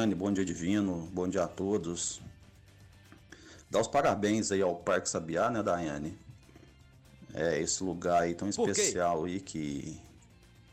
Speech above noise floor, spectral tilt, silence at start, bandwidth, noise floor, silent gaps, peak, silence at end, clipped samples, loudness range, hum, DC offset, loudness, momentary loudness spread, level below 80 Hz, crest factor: 27 dB; -4.5 dB/octave; 0 s; 15 kHz; -58 dBFS; none; -18 dBFS; 0.1 s; under 0.1%; 3 LU; none; under 0.1%; -31 LUFS; 14 LU; -60 dBFS; 16 dB